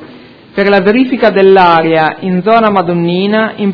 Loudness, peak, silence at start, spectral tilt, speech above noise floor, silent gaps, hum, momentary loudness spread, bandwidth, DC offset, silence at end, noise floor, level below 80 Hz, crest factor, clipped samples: -9 LUFS; 0 dBFS; 0 s; -8.5 dB/octave; 26 dB; none; none; 6 LU; 5.4 kHz; under 0.1%; 0 s; -35 dBFS; -48 dBFS; 10 dB; 1%